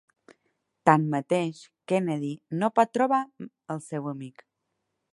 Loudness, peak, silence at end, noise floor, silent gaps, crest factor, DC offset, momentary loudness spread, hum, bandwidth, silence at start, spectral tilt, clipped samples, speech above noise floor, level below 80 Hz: -26 LUFS; -2 dBFS; 0.85 s; -80 dBFS; none; 26 dB; under 0.1%; 17 LU; none; 11.5 kHz; 0.85 s; -7 dB/octave; under 0.1%; 54 dB; -76 dBFS